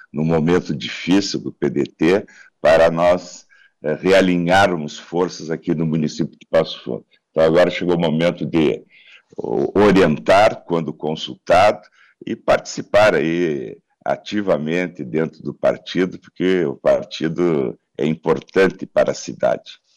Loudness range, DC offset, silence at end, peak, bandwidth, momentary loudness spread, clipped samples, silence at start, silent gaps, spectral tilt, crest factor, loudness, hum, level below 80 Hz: 4 LU; under 0.1%; 0.25 s; -8 dBFS; 12.5 kHz; 12 LU; under 0.1%; 0.15 s; none; -6 dB/octave; 10 dB; -18 LUFS; none; -50 dBFS